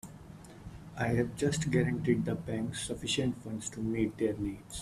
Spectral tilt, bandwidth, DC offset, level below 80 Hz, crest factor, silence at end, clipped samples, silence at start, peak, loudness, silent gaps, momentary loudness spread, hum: -5.5 dB/octave; 14 kHz; under 0.1%; -54 dBFS; 20 dB; 0 s; under 0.1%; 0.05 s; -14 dBFS; -33 LUFS; none; 19 LU; none